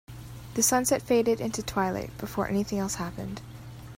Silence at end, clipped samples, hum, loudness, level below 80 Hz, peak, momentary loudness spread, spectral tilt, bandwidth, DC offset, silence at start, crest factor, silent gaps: 0 s; under 0.1%; none; -27 LUFS; -50 dBFS; -10 dBFS; 19 LU; -4 dB/octave; 16 kHz; under 0.1%; 0.1 s; 18 dB; none